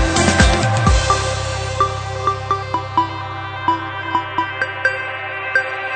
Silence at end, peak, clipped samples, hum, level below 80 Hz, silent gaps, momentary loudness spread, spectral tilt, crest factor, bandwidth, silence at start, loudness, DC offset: 0 s; 0 dBFS; under 0.1%; none; -26 dBFS; none; 9 LU; -4 dB/octave; 18 dB; 9.4 kHz; 0 s; -18 LUFS; under 0.1%